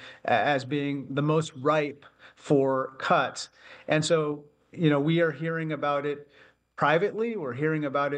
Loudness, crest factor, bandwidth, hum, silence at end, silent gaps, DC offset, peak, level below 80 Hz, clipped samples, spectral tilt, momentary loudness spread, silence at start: -27 LUFS; 18 dB; 10 kHz; none; 0 s; none; under 0.1%; -8 dBFS; -72 dBFS; under 0.1%; -6 dB/octave; 11 LU; 0 s